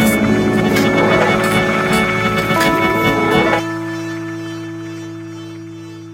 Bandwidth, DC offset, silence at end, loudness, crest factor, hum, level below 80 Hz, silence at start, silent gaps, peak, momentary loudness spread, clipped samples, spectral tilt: 16 kHz; under 0.1%; 0 s; -15 LUFS; 16 dB; none; -40 dBFS; 0 s; none; 0 dBFS; 17 LU; under 0.1%; -5 dB/octave